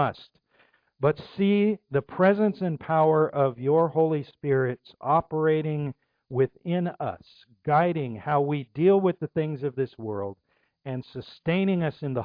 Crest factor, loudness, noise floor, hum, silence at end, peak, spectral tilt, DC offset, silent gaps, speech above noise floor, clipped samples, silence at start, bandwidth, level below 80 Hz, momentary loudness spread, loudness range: 16 dB; -26 LUFS; -64 dBFS; none; 0 s; -10 dBFS; -10.5 dB/octave; under 0.1%; none; 39 dB; under 0.1%; 0 s; 5.2 kHz; -64 dBFS; 13 LU; 4 LU